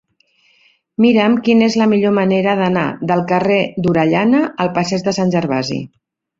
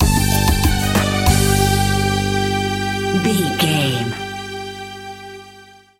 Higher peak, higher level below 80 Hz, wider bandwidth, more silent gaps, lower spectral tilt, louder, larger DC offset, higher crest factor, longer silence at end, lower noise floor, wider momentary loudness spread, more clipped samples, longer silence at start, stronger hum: about the same, -2 dBFS vs -2 dBFS; second, -54 dBFS vs -26 dBFS; second, 7.6 kHz vs 16.5 kHz; neither; first, -6.5 dB/octave vs -4.5 dB/octave; about the same, -15 LUFS vs -17 LUFS; neither; about the same, 14 dB vs 16 dB; first, 0.55 s vs 0.35 s; first, -57 dBFS vs -44 dBFS; second, 6 LU vs 16 LU; neither; first, 1 s vs 0 s; second, none vs 50 Hz at -35 dBFS